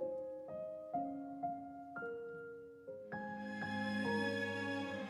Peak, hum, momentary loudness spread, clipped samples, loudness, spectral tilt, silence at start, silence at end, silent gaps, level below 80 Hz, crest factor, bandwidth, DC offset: -26 dBFS; none; 12 LU; under 0.1%; -43 LUFS; -6 dB/octave; 0 s; 0 s; none; -80 dBFS; 16 dB; 12.5 kHz; under 0.1%